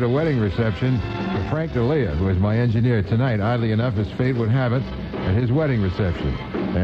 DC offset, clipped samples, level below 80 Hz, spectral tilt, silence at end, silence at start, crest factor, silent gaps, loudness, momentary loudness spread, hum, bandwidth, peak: under 0.1%; under 0.1%; -36 dBFS; -9.5 dB/octave; 0 s; 0 s; 12 dB; none; -21 LUFS; 5 LU; none; 6.2 kHz; -8 dBFS